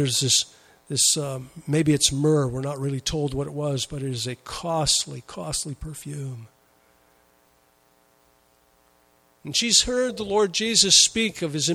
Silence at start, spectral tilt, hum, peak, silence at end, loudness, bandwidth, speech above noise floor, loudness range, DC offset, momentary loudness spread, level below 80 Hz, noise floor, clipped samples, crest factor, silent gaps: 0 s; -3 dB/octave; none; -2 dBFS; 0 s; -22 LUFS; 16 kHz; 38 dB; 15 LU; under 0.1%; 16 LU; -48 dBFS; -62 dBFS; under 0.1%; 22 dB; none